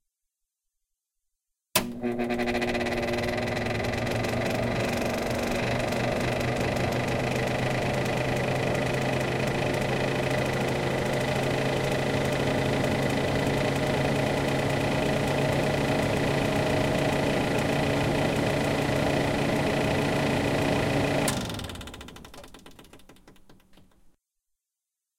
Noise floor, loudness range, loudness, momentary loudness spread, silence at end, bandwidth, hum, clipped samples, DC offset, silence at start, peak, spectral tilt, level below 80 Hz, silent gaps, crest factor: -87 dBFS; 4 LU; -27 LUFS; 3 LU; 1.65 s; 17 kHz; none; under 0.1%; under 0.1%; 1.75 s; -6 dBFS; -5.5 dB/octave; -44 dBFS; none; 22 dB